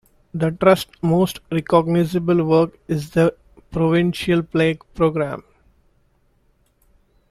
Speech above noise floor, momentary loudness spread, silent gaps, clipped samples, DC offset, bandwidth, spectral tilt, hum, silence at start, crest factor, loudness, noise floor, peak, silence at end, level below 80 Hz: 43 dB; 9 LU; none; under 0.1%; under 0.1%; 14 kHz; -7 dB/octave; none; 0.35 s; 18 dB; -19 LUFS; -61 dBFS; -2 dBFS; 1.9 s; -48 dBFS